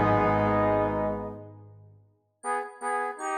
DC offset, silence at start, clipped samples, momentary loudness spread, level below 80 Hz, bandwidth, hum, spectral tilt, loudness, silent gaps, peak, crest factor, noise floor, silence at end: under 0.1%; 0 s; under 0.1%; 16 LU; -48 dBFS; 12 kHz; none; -6.5 dB/octave; -27 LUFS; none; -12 dBFS; 16 dB; -61 dBFS; 0 s